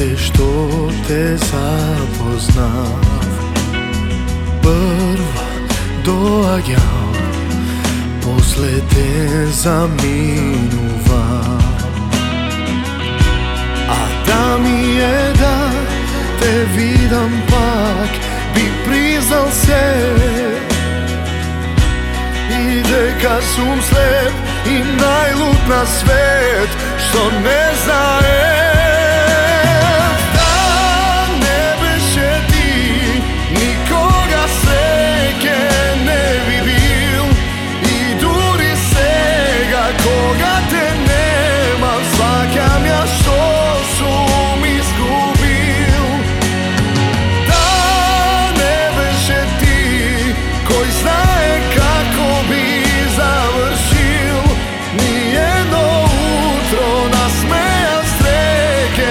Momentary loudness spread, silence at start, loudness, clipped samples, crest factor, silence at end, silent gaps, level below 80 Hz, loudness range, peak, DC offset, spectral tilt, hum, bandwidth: 6 LU; 0 s; -13 LUFS; under 0.1%; 12 dB; 0 s; none; -20 dBFS; 4 LU; 0 dBFS; under 0.1%; -4.5 dB/octave; none; 17.5 kHz